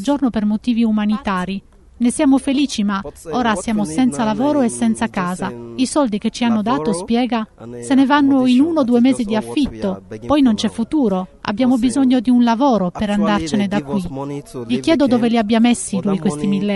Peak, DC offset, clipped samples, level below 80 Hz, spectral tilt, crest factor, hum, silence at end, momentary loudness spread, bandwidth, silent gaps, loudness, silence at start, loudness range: -2 dBFS; under 0.1%; under 0.1%; -44 dBFS; -5.5 dB/octave; 14 dB; none; 0 s; 9 LU; 11.5 kHz; none; -17 LUFS; 0 s; 3 LU